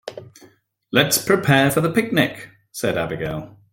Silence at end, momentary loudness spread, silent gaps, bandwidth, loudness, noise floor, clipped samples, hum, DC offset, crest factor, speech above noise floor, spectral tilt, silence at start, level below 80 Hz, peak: 0.2 s; 20 LU; none; 17 kHz; -19 LUFS; -53 dBFS; under 0.1%; none; under 0.1%; 20 dB; 34 dB; -4.5 dB/octave; 0.05 s; -52 dBFS; -2 dBFS